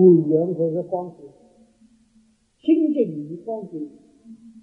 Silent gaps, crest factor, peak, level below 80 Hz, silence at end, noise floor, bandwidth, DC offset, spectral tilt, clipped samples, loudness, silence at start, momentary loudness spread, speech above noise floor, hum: none; 20 dB; -2 dBFS; -72 dBFS; 0.15 s; -60 dBFS; 3.3 kHz; under 0.1%; -11 dB/octave; under 0.1%; -22 LUFS; 0 s; 17 LU; 40 dB; none